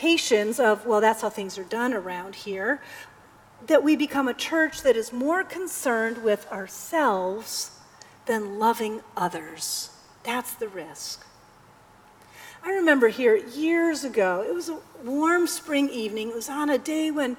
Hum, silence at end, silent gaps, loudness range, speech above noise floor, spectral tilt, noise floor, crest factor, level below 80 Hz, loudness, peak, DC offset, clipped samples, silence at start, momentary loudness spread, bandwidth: none; 0 s; none; 6 LU; 29 dB; -3 dB/octave; -53 dBFS; 20 dB; -66 dBFS; -25 LUFS; -6 dBFS; under 0.1%; under 0.1%; 0 s; 14 LU; 19.5 kHz